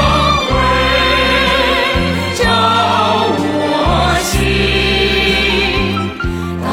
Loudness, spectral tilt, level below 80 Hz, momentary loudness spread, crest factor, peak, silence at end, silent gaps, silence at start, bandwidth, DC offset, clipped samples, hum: -12 LUFS; -4.5 dB/octave; -24 dBFS; 5 LU; 12 dB; 0 dBFS; 0 s; none; 0 s; 17 kHz; under 0.1%; under 0.1%; none